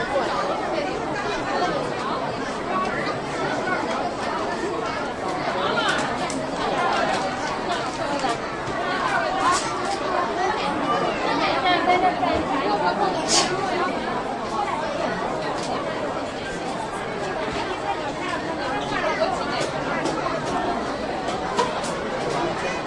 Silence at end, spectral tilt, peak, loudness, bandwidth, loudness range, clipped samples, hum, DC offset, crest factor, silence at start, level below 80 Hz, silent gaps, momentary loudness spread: 0 s; -3.5 dB/octave; -6 dBFS; -24 LUFS; 11.5 kHz; 5 LU; under 0.1%; none; under 0.1%; 18 dB; 0 s; -48 dBFS; none; 6 LU